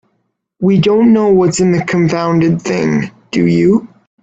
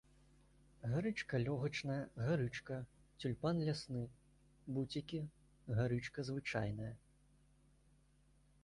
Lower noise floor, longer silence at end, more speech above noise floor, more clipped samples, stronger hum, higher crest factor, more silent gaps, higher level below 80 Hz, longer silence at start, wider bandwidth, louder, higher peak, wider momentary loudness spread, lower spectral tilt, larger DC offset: second, -66 dBFS vs -71 dBFS; second, 0.35 s vs 1.65 s; first, 55 dB vs 31 dB; neither; neither; second, 12 dB vs 18 dB; neither; first, -48 dBFS vs -66 dBFS; second, 0.6 s vs 0.8 s; second, 9 kHz vs 11.5 kHz; first, -12 LUFS vs -42 LUFS; first, 0 dBFS vs -26 dBFS; second, 7 LU vs 12 LU; about the same, -6.5 dB/octave vs -7 dB/octave; neither